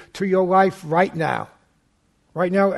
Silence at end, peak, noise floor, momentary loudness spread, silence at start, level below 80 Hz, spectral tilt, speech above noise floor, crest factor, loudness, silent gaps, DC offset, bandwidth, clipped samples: 0 s; -4 dBFS; -64 dBFS; 12 LU; 0 s; -60 dBFS; -7 dB/octave; 45 dB; 18 dB; -20 LUFS; none; under 0.1%; 12.5 kHz; under 0.1%